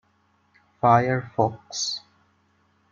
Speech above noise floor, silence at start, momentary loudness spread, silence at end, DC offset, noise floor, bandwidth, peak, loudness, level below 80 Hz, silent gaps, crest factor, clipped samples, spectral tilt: 43 dB; 0.85 s; 9 LU; 0.95 s; under 0.1%; -65 dBFS; 7.6 kHz; -4 dBFS; -23 LUFS; -68 dBFS; none; 22 dB; under 0.1%; -4.5 dB/octave